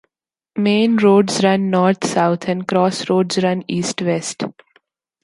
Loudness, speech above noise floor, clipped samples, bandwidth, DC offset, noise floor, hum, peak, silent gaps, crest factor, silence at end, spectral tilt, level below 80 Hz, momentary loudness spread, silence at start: -17 LUFS; 66 dB; under 0.1%; 11.5 kHz; under 0.1%; -82 dBFS; none; -2 dBFS; none; 16 dB; 0.7 s; -5.5 dB/octave; -64 dBFS; 9 LU; 0.55 s